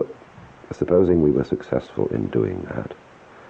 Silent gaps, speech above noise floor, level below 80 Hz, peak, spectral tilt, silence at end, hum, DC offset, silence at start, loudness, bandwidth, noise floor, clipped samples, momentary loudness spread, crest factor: none; 24 dB; -46 dBFS; -6 dBFS; -9.5 dB/octave; 0.05 s; none; under 0.1%; 0 s; -22 LUFS; 7.6 kHz; -45 dBFS; under 0.1%; 19 LU; 16 dB